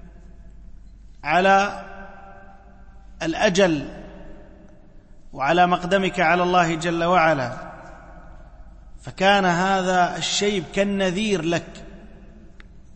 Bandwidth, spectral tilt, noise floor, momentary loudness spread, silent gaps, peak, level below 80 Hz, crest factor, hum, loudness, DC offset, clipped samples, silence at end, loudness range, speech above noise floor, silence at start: 8.8 kHz; -4.5 dB/octave; -45 dBFS; 23 LU; none; -4 dBFS; -44 dBFS; 18 dB; none; -20 LUFS; under 0.1%; under 0.1%; 0.05 s; 5 LU; 25 dB; 0 s